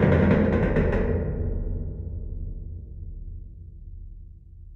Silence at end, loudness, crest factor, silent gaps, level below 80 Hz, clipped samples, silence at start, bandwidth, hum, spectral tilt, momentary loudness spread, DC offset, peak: 0 s; -25 LUFS; 18 dB; none; -32 dBFS; under 0.1%; 0 s; 5.6 kHz; none; -10 dB/octave; 24 LU; under 0.1%; -8 dBFS